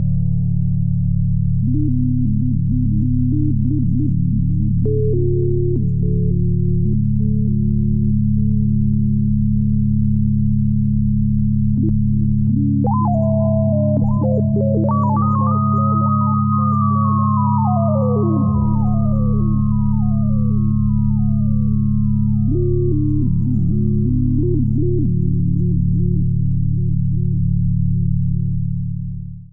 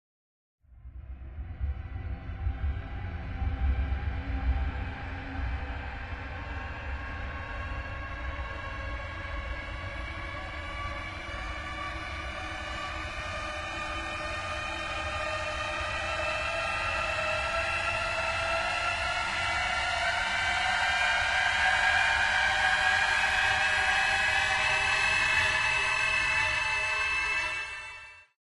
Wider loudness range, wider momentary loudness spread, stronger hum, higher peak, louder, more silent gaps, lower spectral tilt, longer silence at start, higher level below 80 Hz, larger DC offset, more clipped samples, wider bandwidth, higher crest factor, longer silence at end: second, 2 LU vs 13 LU; second, 2 LU vs 14 LU; neither; first, -6 dBFS vs -12 dBFS; first, -17 LUFS vs -29 LUFS; neither; first, -16.5 dB/octave vs -3 dB/octave; second, 0 s vs 0.7 s; first, -26 dBFS vs -40 dBFS; neither; neither; second, 1.4 kHz vs 11.5 kHz; second, 10 dB vs 18 dB; second, 0.05 s vs 0.3 s